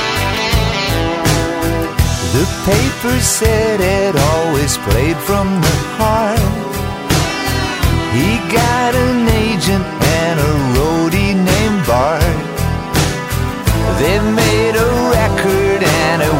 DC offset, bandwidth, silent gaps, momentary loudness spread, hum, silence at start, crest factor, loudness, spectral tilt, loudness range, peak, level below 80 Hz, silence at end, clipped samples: under 0.1%; 16.5 kHz; none; 4 LU; none; 0 s; 14 dB; -14 LUFS; -5 dB/octave; 1 LU; 0 dBFS; -24 dBFS; 0 s; under 0.1%